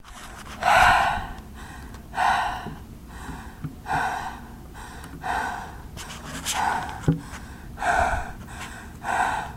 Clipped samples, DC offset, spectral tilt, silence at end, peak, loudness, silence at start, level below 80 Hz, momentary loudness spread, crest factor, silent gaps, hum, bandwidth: under 0.1%; under 0.1%; -3.5 dB/octave; 0 s; -4 dBFS; -24 LUFS; 0 s; -40 dBFS; 19 LU; 24 dB; none; none; 16 kHz